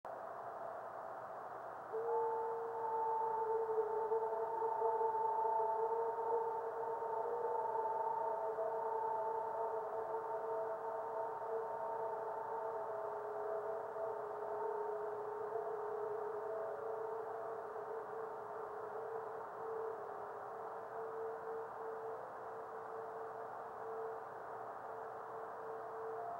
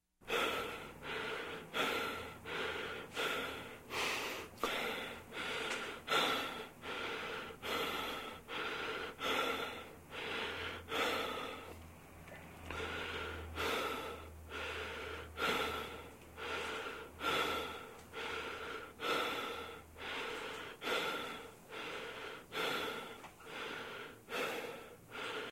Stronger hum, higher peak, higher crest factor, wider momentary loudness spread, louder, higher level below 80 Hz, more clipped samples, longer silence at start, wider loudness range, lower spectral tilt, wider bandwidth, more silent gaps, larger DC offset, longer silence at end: neither; second, -26 dBFS vs -20 dBFS; second, 16 dB vs 22 dB; about the same, 10 LU vs 12 LU; about the same, -42 LUFS vs -40 LUFS; second, -84 dBFS vs -64 dBFS; neither; second, 0.05 s vs 0.2 s; first, 8 LU vs 4 LU; first, -6 dB/octave vs -2.5 dB/octave; about the same, 16 kHz vs 16 kHz; neither; neither; about the same, 0 s vs 0 s